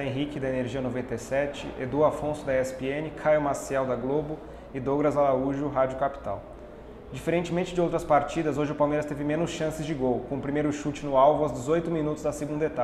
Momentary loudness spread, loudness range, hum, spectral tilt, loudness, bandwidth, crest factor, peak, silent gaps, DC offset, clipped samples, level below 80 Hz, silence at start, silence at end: 10 LU; 2 LU; none; -6.5 dB/octave; -27 LUFS; 14 kHz; 18 dB; -8 dBFS; none; under 0.1%; under 0.1%; -48 dBFS; 0 s; 0 s